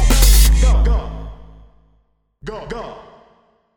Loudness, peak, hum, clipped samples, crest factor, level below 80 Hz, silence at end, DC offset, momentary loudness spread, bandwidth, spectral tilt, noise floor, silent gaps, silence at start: -15 LUFS; 0 dBFS; none; under 0.1%; 16 dB; -16 dBFS; 0.8 s; under 0.1%; 23 LU; over 20 kHz; -4 dB/octave; -60 dBFS; none; 0 s